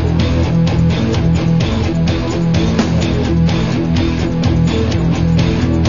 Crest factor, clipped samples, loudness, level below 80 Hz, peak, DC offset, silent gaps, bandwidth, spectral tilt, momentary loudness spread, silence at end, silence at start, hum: 12 dB; under 0.1%; -14 LUFS; -26 dBFS; -2 dBFS; 2%; none; 7.4 kHz; -7 dB/octave; 2 LU; 0 s; 0 s; none